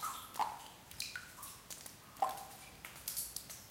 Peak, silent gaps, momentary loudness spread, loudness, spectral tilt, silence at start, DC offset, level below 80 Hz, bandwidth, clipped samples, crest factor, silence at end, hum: -20 dBFS; none; 11 LU; -44 LUFS; -1 dB/octave; 0 s; under 0.1%; -70 dBFS; 17 kHz; under 0.1%; 26 dB; 0 s; none